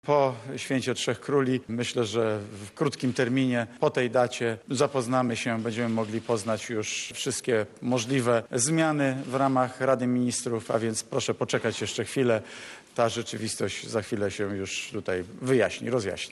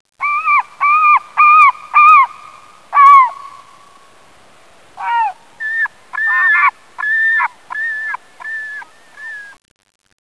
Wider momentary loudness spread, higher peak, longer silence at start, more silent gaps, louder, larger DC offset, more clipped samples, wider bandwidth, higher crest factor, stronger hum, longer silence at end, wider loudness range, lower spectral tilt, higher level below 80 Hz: second, 6 LU vs 20 LU; second, -10 dBFS vs 0 dBFS; second, 0.05 s vs 0.2 s; neither; second, -27 LUFS vs -11 LUFS; second, under 0.1% vs 0.4%; neither; first, 12.5 kHz vs 11 kHz; about the same, 18 dB vs 14 dB; neither; second, 0 s vs 0.75 s; second, 3 LU vs 10 LU; first, -4.5 dB/octave vs 0 dB/octave; about the same, -70 dBFS vs -66 dBFS